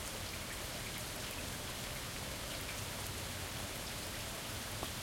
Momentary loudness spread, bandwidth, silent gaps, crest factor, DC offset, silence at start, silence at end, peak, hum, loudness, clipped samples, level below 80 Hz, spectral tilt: 1 LU; 17 kHz; none; 20 dB; under 0.1%; 0 s; 0 s; -24 dBFS; none; -42 LUFS; under 0.1%; -54 dBFS; -2.5 dB/octave